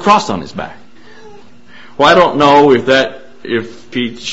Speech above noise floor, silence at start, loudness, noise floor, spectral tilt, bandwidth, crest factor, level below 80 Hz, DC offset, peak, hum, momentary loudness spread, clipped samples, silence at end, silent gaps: 29 dB; 0 s; -11 LUFS; -40 dBFS; -4.5 dB/octave; 8.2 kHz; 14 dB; -46 dBFS; 2%; 0 dBFS; none; 18 LU; under 0.1%; 0 s; none